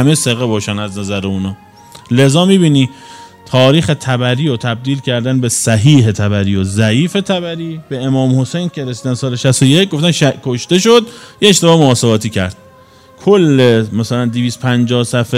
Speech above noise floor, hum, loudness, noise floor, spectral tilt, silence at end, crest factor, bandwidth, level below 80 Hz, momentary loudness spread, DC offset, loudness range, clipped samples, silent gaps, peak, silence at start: 30 dB; none; -12 LUFS; -42 dBFS; -5 dB/octave; 0 s; 12 dB; 15.5 kHz; -50 dBFS; 10 LU; under 0.1%; 3 LU; 0.1%; none; 0 dBFS; 0 s